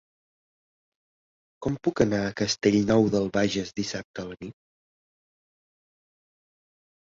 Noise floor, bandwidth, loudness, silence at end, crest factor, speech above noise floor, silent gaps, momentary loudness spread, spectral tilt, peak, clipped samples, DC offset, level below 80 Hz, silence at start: under -90 dBFS; 7.8 kHz; -25 LUFS; 2.5 s; 22 dB; over 65 dB; 4.04-4.14 s; 16 LU; -5 dB/octave; -6 dBFS; under 0.1%; under 0.1%; -56 dBFS; 1.6 s